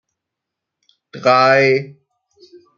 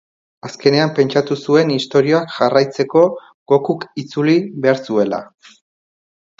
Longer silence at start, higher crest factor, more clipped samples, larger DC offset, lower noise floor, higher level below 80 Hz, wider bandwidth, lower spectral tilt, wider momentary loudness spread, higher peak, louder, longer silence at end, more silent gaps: first, 1.15 s vs 0.45 s; about the same, 18 dB vs 16 dB; neither; neither; second, -81 dBFS vs under -90 dBFS; about the same, -68 dBFS vs -64 dBFS; about the same, 7.2 kHz vs 7.6 kHz; about the same, -5.5 dB/octave vs -6.5 dB/octave; about the same, 11 LU vs 9 LU; about the same, -2 dBFS vs 0 dBFS; about the same, -14 LUFS vs -16 LUFS; second, 0.85 s vs 1.15 s; second, none vs 3.34-3.46 s